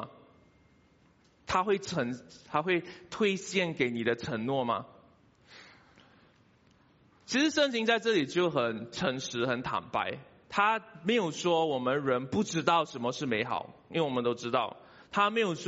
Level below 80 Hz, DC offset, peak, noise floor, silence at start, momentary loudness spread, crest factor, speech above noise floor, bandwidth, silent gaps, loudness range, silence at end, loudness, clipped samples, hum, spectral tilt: -68 dBFS; under 0.1%; -12 dBFS; -64 dBFS; 0 s; 8 LU; 20 dB; 34 dB; 8 kHz; none; 5 LU; 0 s; -30 LUFS; under 0.1%; none; -3 dB/octave